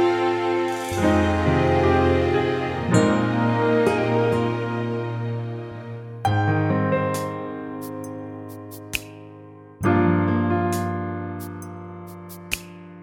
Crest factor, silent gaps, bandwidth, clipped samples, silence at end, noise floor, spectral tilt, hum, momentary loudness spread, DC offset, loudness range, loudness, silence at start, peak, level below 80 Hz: 18 dB; none; 17 kHz; under 0.1%; 0 s; -43 dBFS; -6.5 dB/octave; none; 17 LU; under 0.1%; 6 LU; -22 LUFS; 0 s; -4 dBFS; -44 dBFS